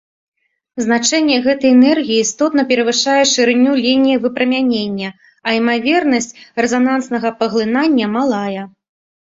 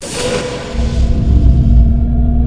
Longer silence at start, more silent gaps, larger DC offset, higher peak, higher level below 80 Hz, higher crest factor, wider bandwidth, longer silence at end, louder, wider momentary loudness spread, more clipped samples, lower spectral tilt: first, 0.75 s vs 0 s; neither; neither; about the same, 0 dBFS vs 0 dBFS; second, -58 dBFS vs -12 dBFS; about the same, 14 dB vs 10 dB; second, 7.8 kHz vs 10.5 kHz; first, 0.6 s vs 0 s; about the same, -14 LUFS vs -14 LUFS; about the same, 10 LU vs 8 LU; second, under 0.1% vs 0.5%; second, -3 dB/octave vs -6.5 dB/octave